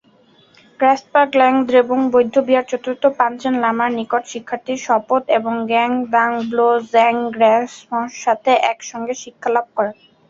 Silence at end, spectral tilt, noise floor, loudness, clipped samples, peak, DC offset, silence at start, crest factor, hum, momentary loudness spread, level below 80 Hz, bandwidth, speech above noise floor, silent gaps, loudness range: 0.35 s; -4 dB/octave; -52 dBFS; -17 LUFS; under 0.1%; -2 dBFS; under 0.1%; 0.8 s; 16 dB; none; 10 LU; -64 dBFS; 7.6 kHz; 36 dB; none; 3 LU